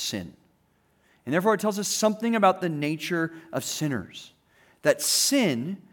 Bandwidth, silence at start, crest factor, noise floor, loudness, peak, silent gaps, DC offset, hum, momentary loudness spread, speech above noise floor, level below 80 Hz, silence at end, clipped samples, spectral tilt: over 20 kHz; 0 s; 20 dB; -66 dBFS; -25 LUFS; -6 dBFS; none; under 0.1%; none; 14 LU; 41 dB; -72 dBFS; 0.15 s; under 0.1%; -3.5 dB/octave